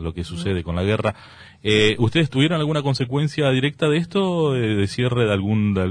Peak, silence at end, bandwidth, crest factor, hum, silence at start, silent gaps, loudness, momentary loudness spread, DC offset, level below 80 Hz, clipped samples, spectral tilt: -4 dBFS; 0 s; 10.5 kHz; 16 dB; none; 0 s; none; -20 LUFS; 7 LU; under 0.1%; -44 dBFS; under 0.1%; -6.5 dB/octave